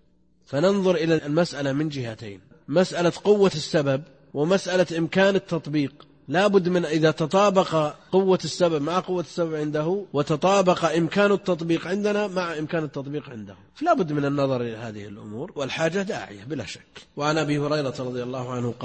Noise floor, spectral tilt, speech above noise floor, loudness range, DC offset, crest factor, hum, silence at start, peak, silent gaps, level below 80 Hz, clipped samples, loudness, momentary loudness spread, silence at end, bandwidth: -60 dBFS; -6 dB/octave; 37 dB; 5 LU; under 0.1%; 18 dB; none; 0.5 s; -6 dBFS; none; -60 dBFS; under 0.1%; -23 LUFS; 13 LU; 0 s; 8.8 kHz